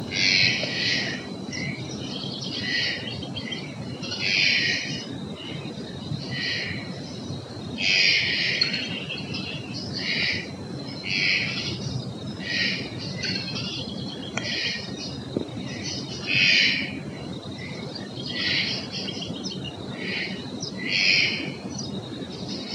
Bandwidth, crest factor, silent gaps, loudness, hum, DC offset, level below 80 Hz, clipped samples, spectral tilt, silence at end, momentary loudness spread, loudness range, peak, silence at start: 11.5 kHz; 22 dB; none; -25 LUFS; none; under 0.1%; -60 dBFS; under 0.1%; -3 dB/octave; 0 s; 16 LU; 5 LU; -6 dBFS; 0 s